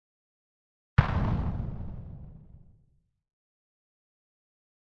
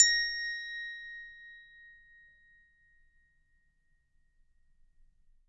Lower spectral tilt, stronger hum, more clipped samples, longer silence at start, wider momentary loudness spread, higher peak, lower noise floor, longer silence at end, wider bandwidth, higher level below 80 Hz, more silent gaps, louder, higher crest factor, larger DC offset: first, -9 dB/octave vs 6.5 dB/octave; neither; neither; first, 1 s vs 0 s; second, 20 LU vs 25 LU; about the same, -6 dBFS vs -8 dBFS; about the same, -68 dBFS vs -71 dBFS; second, 2.35 s vs 3.6 s; second, 6.4 kHz vs 9.6 kHz; first, -42 dBFS vs -66 dBFS; neither; about the same, -30 LUFS vs -31 LUFS; about the same, 28 dB vs 28 dB; neither